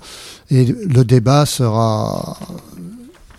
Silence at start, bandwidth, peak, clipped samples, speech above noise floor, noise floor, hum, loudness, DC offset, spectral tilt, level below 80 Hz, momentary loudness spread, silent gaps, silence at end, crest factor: 0.05 s; 14.5 kHz; 0 dBFS; under 0.1%; 24 dB; -38 dBFS; none; -15 LUFS; under 0.1%; -6.5 dB/octave; -44 dBFS; 22 LU; none; 0.3 s; 16 dB